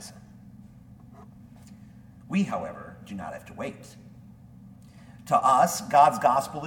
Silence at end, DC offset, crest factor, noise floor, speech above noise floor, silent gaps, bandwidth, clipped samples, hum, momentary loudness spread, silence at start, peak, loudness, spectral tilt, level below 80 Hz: 0 s; under 0.1%; 22 dB; -49 dBFS; 25 dB; none; 18 kHz; under 0.1%; none; 24 LU; 0 s; -6 dBFS; -24 LUFS; -5 dB/octave; -60 dBFS